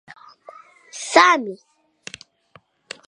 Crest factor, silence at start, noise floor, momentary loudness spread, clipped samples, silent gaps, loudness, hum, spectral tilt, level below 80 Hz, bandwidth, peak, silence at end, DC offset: 24 dB; 0.95 s; -55 dBFS; 27 LU; under 0.1%; none; -16 LUFS; none; -1.5 dB/octave; -70 dBFS; 11.5 kHz; 0 dBFS; 1.55 s; under 0.1%